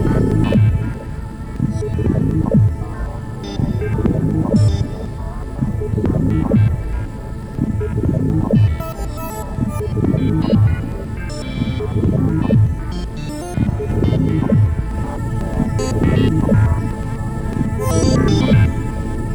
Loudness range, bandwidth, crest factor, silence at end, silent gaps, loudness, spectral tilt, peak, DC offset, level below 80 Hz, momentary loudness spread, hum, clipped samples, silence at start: 3 LU; 16.5 kHz; 16 dB; 0 s; none; -18 LUFS; -8 dB/octave; -2 dBFS; under 0.1%; -26 dBFS; 11 LU; none; under 0.1%; 0 s